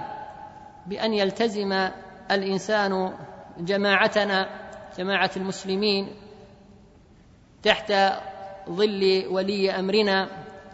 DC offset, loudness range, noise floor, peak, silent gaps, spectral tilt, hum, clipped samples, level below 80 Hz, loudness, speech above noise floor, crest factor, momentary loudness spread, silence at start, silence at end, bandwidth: under 0.1%; 3 LU; -53 dBFS; -2 dBFS; none; -5 dB/octave; none; under 0.1%; -60 dBFS; -24 LUFS; 29 dB; 24 dB; 19 LU; 0 s; 0 s; 8 kHz